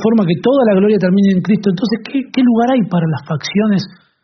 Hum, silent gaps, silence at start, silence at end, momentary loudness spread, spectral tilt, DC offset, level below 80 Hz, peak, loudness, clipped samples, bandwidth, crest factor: none; none; 0 s; 0.35 s; 7 LU; -6.5 dB/octave; under 0.1%; -54 dBFS; -2 dBFS; -14 LUFS; under 0.1%; 6.4 kHz; 12 dB